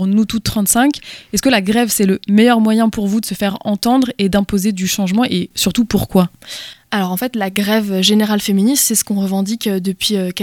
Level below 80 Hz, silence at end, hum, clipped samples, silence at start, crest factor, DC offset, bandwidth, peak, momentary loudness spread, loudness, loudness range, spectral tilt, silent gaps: -42 dBFS; 0 s; none; under 0.1%; 0 s; 14 dB; under 0.1%; 18 kHz; 0 dBFS; 7 LU; -15 LUFS; 3 LU; -4 dB/octave; none